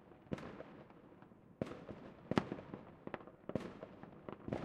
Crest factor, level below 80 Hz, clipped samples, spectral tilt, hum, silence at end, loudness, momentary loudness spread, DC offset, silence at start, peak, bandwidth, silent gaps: 34 dB; -70 dBFS; under 0.1%; -7 dB/octave; none; 0 s; -47 LUFS; 20 LU; under 0.1%; 0 s; -12 dBFS; 11.5 kHz; none